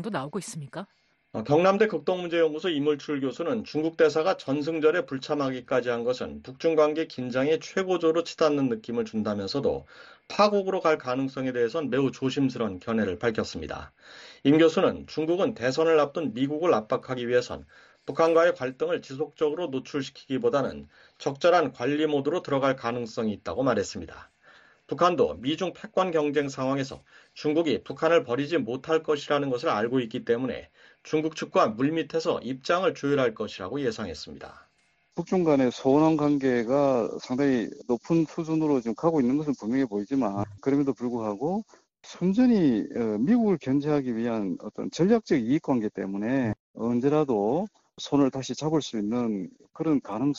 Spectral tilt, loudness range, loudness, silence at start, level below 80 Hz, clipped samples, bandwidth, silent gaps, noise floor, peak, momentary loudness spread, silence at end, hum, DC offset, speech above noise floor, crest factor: -6 dB/octave; 3 LU; -26 LUFS; 0 s; -62 dBFS; under 0.1%; 9 kHz; 46.59-46.74 s; -68 dBFS; -8 dBFS; 11 LU; 0 s; none; under 0.1%; 42 dB; 18 dB